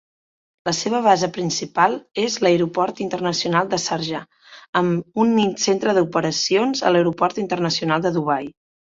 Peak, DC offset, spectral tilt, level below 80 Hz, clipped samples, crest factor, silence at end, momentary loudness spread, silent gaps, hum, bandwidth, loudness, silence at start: -2 dBFS; under 0.1%; -4.5 dB/octave; -62 dBFS; under 0.1%; 18 dB; 0.4 s; 7 LU; 4.69-4.73 s; none; 7.8 kHz; -20 LUFS; 0.65 s